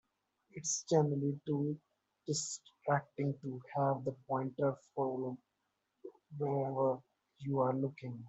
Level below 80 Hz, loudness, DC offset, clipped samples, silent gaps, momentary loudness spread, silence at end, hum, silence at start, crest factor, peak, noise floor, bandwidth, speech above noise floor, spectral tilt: -80 dBFS; -37 LUFS; under 0.1%; under 0.1%; none; 14 LU; 0 s; none; 0.55 s; 20 dB; -18 dBFS; -84 dBFS; 8.2 kHz; 48 dB; -5.5 dB/octave